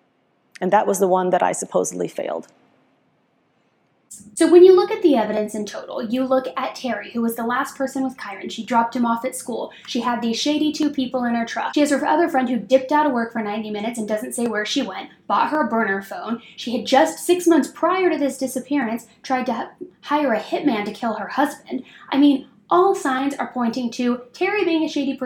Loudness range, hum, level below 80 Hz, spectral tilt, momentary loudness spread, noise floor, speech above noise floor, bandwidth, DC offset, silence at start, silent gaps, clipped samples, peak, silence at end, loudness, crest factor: 6 LU; none; -68 dBFS; -4 dB/octave; 11 LU; -64 dBFS; 44 dB; 16.5 kHz; under 0.1%; 0.6 s; none; under 0.1%; -2 dBFS; 0 s; -20 LUFS; 20 dB